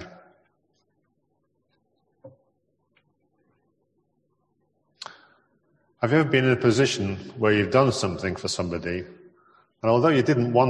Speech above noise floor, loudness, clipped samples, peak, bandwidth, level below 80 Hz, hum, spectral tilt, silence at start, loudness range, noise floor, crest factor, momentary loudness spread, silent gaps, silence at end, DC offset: 51 dB; -23 LUFS; under 0.1%; -4 dBFS; 11.5 kHz; -54 dBFS; none; -5.5 dB/octave; 0 s; 5 LU; -73 dBFS; 22 dB; 18 LU; none; 0 s; under 0.1%